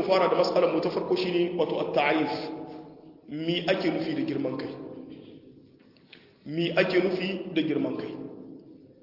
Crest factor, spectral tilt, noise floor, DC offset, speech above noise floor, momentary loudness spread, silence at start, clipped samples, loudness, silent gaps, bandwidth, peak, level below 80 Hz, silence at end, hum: 20 dB; -6.5 dB/octave; -56 dBFS; under 0.1%; 30 dB; 21 LU; 0 s; under 0.1%; -27 LUFS; none; 5.8 kHz; -8 dBFS; -70 dBFS; 0.1 s; none